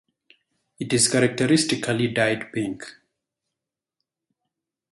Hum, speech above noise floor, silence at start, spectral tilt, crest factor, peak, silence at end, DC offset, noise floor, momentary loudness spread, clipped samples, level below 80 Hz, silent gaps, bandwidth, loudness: none; 64 dB; 0.8 s; -4 dB/octave; 20 dB; -4 dBFS; 2 s; under 0.1%; -87 dBFS; 15 LU; under 0.1%; -62 dBFS; none; 11.5 kHz; -22 LUFS